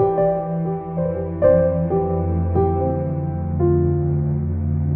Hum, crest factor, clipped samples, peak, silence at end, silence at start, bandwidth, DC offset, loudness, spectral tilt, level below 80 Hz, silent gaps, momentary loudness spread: none; 16 dB; under 0.1%; -4 dBFS; 0 s; 0 s; 2.8 kHz; under 0.1%; -20 LUFS; -12 dB/octave; -34 dBFS; none; 7 LU